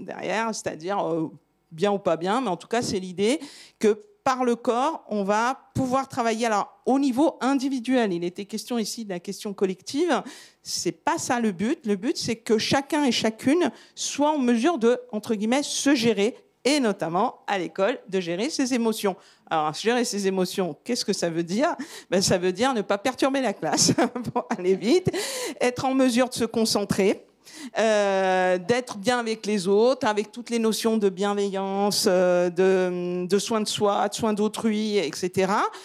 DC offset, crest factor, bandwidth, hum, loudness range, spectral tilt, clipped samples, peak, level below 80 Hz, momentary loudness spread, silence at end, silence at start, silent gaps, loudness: under 0.1%; 18 dB; 16 kHz; none; 3 LU; -4 dB/octave; under 0.1%; -6 dBFS; -66 dBFS; 7 LU; 0 s; 0 s; none; -24 LUFS